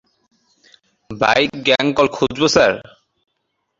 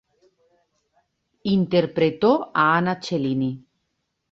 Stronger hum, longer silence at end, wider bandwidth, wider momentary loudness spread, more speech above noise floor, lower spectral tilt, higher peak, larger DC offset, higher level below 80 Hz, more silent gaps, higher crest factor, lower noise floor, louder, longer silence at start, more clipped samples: neither; first, 0.95 s vs 0.75 s; about the same, 7.8 kHz vs 7.6 kHz; about the same, 7 LU vs 9 LU; about the same, 57 dB vs 55 dB; second, -3.5 dB/octave vs -7 dB/octave; first, 0 dBFS vs -6 dBFS; neither; first, -50 dBFS vs -62 dBFS; neither; about the same, 18 dB vs 18 dB; second, -72 dBFS vs -76 dBFS; first, -16 LUFS vs -21 LUFS; second, 1.1 s vs 1.45 s; neither